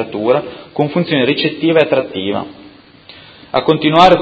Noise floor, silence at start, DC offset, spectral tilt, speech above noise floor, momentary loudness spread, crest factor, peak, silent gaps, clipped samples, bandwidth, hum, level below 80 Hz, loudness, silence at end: -40 dBFS; 0 s; under 0.1%; -6.5 dB/octave; 27 dB; 10 LU; 14 dB; 0 dBFS; none; 0.3%; 8 kHz; none; -48 dBFS; -14 LUFS; 0 s